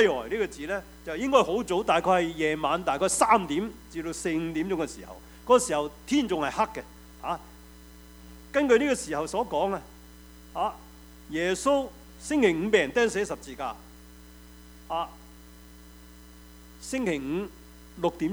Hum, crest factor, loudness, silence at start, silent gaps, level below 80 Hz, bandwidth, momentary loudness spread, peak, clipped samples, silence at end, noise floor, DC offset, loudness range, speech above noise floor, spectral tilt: none; 22 dB; -27 LUFS; 0 s; none; -52 dBFS; over 20 kHz; 15 LU; -6 dBFS; under 0.1%; 0 s; -49 dBFS; under 0.1%; 10 LU; 23 dB; -4 dB/octave